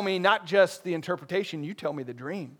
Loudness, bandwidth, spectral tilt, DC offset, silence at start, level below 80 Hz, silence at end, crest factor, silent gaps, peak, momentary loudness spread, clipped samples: -28 LUFS; 17.5 kHz; -5 dB/octave; under 0.1%; 0 s; -80 dBFS; 0.05 s; 20 dB; none; -6 dBFS; 13 LU; under 0.1%